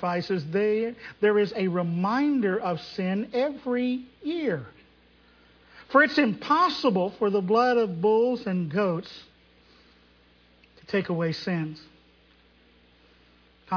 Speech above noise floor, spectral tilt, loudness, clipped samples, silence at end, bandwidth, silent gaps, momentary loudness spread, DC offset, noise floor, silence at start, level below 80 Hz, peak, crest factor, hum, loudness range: 34 dB; -7 dB/octave; -25 LUFS; under 0.1%; 0 s; 5.4 kHz; none; 10 LU; under 0.1%; -59 dBFS; 0 s; -64 dBFS; -6 dBFS; 20 dB; 60 Hz at -50 dBFS; 10 LU